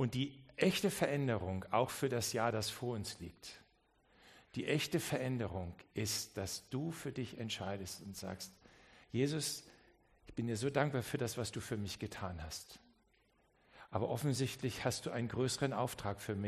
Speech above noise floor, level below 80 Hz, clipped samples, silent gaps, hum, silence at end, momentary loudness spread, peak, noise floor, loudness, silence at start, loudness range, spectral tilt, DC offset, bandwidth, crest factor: 35 dB; -66 dBFS; under 0.1%; none; none; 0 s; 11 LU; -16 dBFS; -74 dBFS; -39 LUFS; 0 s; 5 LU; -4.5 dB/octave; under 0.1%; 13 kHz; 24 dB